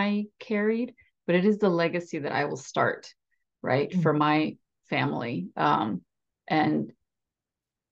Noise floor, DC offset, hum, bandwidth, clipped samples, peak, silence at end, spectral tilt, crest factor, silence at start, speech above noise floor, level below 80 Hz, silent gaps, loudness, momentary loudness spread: -89 dBFS; under 0.1%; none; 8 kHz; under 0.1%; -10 dBFS; 1 s; -6.5 dB/octave; 18 dB; 0 s; 63 dB; -74 dBFS; none; -27 LUFS; 9 LU